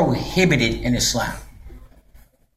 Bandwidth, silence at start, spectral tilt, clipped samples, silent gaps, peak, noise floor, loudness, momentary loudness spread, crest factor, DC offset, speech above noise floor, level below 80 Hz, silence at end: 15 kHz; 0 s; -4 dB/octave; under 0.1%; none; -4 dBFS; -50 dBFS; -19 LUFS; 10 LU; 18 dB; under 0.1%; 31 dB; -36 dBFS; 0.7 s